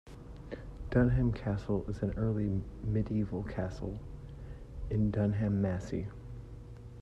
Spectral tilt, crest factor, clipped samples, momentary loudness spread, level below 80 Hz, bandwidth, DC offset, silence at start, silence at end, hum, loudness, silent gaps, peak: -9.5 dB/octave; 20 dB; under 0.1%; 18 LU; -44 dBFS; 8 kHz; under 0.1%; 0.05 s; 0 s; none; -33 LUFS; none; -14 dBFS